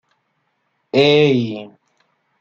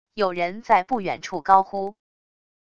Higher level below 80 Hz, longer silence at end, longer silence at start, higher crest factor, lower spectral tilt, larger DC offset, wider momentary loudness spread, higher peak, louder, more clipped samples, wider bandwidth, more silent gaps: about the same, -62 dBFS vs -60 dBFS; about the same, 0.75 s vs 0.75 s; first, 0.95 s vs 0.15 s; about the same, 18 dB vs 20 dB; first, -6.5 dB/octave vs -5 dB/octave; second, under 0.1% vs 0.5%; first, 14 LU vs 11 LU; about the same, -2 dBFS vs -2 dBFS; first, -15 LUFS vs -22 LUFS; neither; about the same, 7.2 kHz vs 7.4 kHz; neither